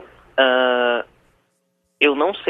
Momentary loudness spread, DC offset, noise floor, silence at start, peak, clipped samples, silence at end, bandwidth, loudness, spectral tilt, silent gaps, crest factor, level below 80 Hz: 10 LU; under 0.1%; -69 dBFS; 0 s; 0 dBFS; under 0.1%; 0 s; 5.6 kHz; -18 LUFS; -4.5 dB/octave; none; 20 dB; -62 dBFS